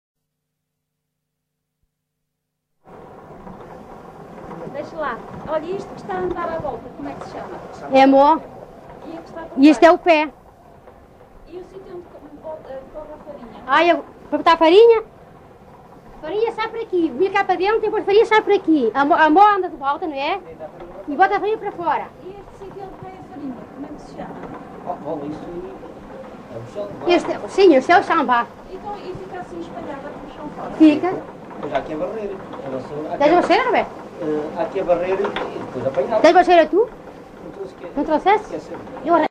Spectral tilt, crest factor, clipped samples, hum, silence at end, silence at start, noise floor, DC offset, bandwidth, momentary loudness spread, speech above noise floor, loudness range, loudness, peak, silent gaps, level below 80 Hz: -5.5 dB/octave; 20 dB; under 0.1%; none; 0.05 s; 2.9 s; -78 dBFS; under 0.1%; 9.8 kHz; 24 LU; 60 dB; 15 LU; -17 LUFS; 0 dBFS; none; -50 dBFS